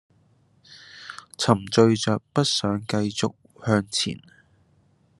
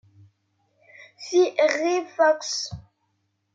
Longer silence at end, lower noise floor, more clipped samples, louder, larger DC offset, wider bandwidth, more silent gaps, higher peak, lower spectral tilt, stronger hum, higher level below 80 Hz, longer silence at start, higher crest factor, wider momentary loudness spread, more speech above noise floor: first, 1 s vs 0.75 s; second, -62 dBFS vs -73 dBFS; neither; about the same, -23 LUFS vs -23 LUFS; neither; first, 12 kHz vs 7.8 kHz; neither; first, -2 dBFS vs -8 dBFS; first, -5 dB/octave vs -3 dB/octave; neither; about the same, -66 dBFS vs -62 dBFS; second, 0.7 s vs 1 s; first, 24 dB vs 18 dB; first, 21 LU vs 15 LU; second, 39 dB vs 51 dB